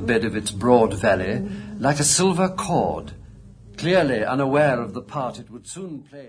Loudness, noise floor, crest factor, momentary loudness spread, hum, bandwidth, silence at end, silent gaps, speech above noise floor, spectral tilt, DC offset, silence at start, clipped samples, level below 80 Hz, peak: -21 LUFS; -44 dBFS; 20 dB; 17 LU; none; 11 kHz; 0 s; none; 22 dB; -4.5 dB/octave; under 0.1%; 0 s; under 0.1%; -46 dBFS; -2 dBFS